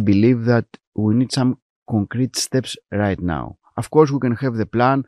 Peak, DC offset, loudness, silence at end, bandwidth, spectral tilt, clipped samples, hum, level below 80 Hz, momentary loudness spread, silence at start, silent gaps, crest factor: 0 dBFS; under 0.1%; -19 LUFS; 0.05 s; 13 kHz; -6 dB/octave; under 0.1%; none; -48 dBFS; 11 LU; 0 s; 0.87-0.92 s, 1.62-1.86 s; 18 dB